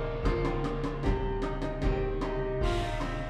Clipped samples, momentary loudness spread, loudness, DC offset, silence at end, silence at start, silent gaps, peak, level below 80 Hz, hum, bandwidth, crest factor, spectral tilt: under 0.1%; 3 LU; -32 LUFS; under 0.1%; 0 s; 0 s; none; -16 dBFS; -34 dBFS; none; 9.8 kHz; 14 dB; -7 dB/octave